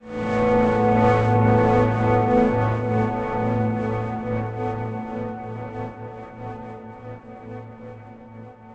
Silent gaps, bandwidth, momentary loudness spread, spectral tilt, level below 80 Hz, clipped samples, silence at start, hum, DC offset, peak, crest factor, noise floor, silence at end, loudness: none; 7.6 kHz; 21 LU; -9 dB/octave; -42 dBFS; under 0.1%; 0.05 s; none; under 0.1%; -6 dBFS; 16 dB; -41 dBFS; 0 s; -21 LUFS